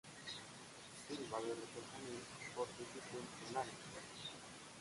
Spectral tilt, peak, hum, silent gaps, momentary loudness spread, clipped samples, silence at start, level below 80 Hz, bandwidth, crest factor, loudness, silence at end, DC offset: -3 dB/octave; -28 dBFS; none; none; 9 LU; under 0.1%; 0.05 s; -78 dBFS; 11.5 kHz; 20 dB; -49 LUFS; 0 s; under 0.1%